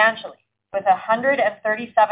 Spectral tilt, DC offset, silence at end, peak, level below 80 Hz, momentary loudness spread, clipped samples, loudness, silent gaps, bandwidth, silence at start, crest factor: -7 dB/octave; under 0.1%; 0 s; -4 dBFS; -66 dBFS; 13 LU; under 0.1%; -20 LUFS; none; 4 kHz; 0 s; 16 dB